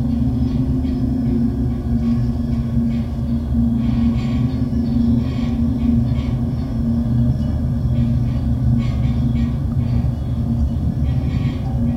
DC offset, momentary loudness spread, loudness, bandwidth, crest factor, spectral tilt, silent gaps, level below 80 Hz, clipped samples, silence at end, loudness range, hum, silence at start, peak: under 0.1%; 3 LU; -19 LUFS; 7.4 kHz; 12 dB; -9.5 dB/octave; none; -26 dBFS; under 0.1%; 0 s; 1 LU; none; 0 s; -6 dBFS